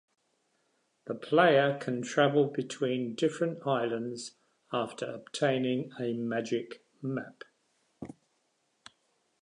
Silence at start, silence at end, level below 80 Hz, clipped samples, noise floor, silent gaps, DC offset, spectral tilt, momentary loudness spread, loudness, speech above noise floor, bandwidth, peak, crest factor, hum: 1.05 s; 1.3 s; -78 dBFS; under 0.1%; -76 dBFS; none; under 0.1%; -5.5 dB/octave; 20 LU; -30 LUFS; 46 dB; 11 kHz; -10 dBFS; 22 dB; none